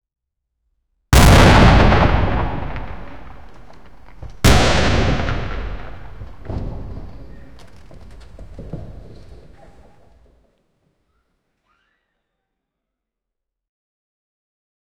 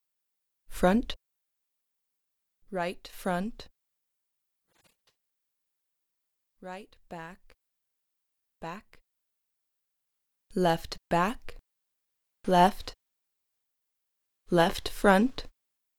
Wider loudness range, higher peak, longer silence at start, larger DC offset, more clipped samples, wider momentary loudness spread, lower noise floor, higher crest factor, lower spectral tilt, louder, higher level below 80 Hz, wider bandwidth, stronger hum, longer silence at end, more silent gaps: first, 26 LU vs 20 LU; first, 0 dBFS vs -8 dBFS; second, 0 s vs 0.7 s; neither; neither; first, 28 LU vs 21 LU; about the same, -82 dBFS vs -82 dBFS; second, 18 dB vs 24 dB; about the same, -5.5 dB/octave vs -5.5 dB/octave; first, -14 LUFS vs -28 LUFS; first, -24 dBFS vs -50 dBFS; about the same, over 20 kHz vs 18.5 kHz; neither; first, 1.3 s vs 0.5 s; neither